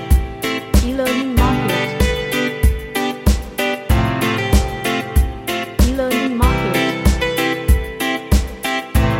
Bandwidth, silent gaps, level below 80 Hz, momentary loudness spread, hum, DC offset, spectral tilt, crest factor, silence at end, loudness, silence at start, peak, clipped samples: 17 kHz; none; -20 dBFS; 5 LU; none; under 0.1%; -5.5 dB/octave; 16 dB; 0 s; -18 LUFS; 0 s; 0 dBFS; under 0.1%